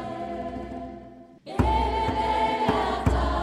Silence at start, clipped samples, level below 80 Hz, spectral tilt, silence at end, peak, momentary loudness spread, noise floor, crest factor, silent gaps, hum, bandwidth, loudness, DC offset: 0 s; under 0.1%; -34 dBFS; -6.5 dB/octave; 0 s; -8 dBFS; 15 LU; -46 dBFS; 18 dB; none; none; 11.5 kHz; -26 LUFS; under 0.1%